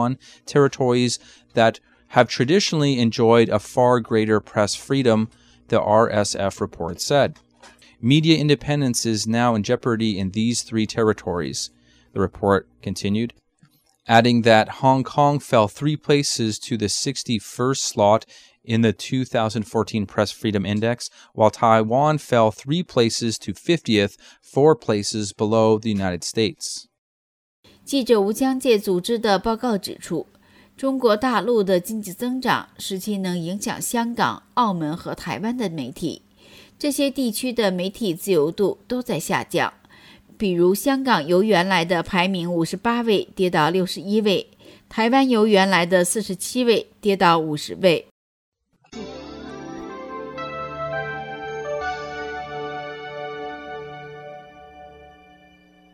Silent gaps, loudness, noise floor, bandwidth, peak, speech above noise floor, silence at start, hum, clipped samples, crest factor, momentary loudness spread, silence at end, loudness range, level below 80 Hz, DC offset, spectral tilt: 26.98-27.63 s, 48.11-48.52 s; -21 LUFS; -59 dBFS; 17 kHz; -2 dBFS; 39 dB; 0 s; none; under 0.1%; 20 dB; 13 LU; 0.9 s; 9 LU; -56 dBFS; under 0.1%; -5 dB/octave